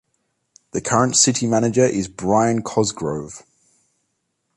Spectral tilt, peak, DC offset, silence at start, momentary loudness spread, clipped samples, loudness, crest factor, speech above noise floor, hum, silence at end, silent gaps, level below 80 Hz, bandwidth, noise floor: -4 dB/octave; -2 dBFS; under 0.1%; 0.75 s; 15 LU; under 0.1%; -19 LUFS; 18 dB; 54 dB; none; 1.15 s; none; -52 dBFS; 11.5 kHz; -73 dBFS